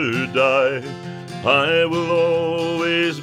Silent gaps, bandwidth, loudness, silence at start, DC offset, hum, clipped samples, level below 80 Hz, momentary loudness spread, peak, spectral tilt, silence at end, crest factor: none; 11 kHz; -18 LUFS; 0 s; under 0.1%; none; under 0.1%; -64 dBFS; 13 LU; -4 dBFS; -5.5 dB/octave; 0 s; 16 dB